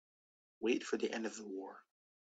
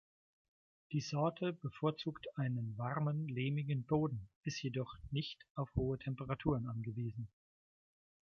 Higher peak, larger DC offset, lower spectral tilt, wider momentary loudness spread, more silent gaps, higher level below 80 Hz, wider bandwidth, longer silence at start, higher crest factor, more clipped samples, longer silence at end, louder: about the same, -22 dBFS vs -20 dBFS; neither; second, -3.5 dB/octave vs -7 dB/octave; first, 14 LU vs 7 LU; second, none vs 4.36-4.43 s, 5.50-5.55 s; second, -86 dBFS vs -60 dBFS; first, 9 kHz vs 7 kHz; second, 0.6 s vs 0.9 s; about the same, 20 dB vs 20 dB; neither; second, 0.45 s vs 1.1 s; about the same, -40 LUFS vs -40 LUFS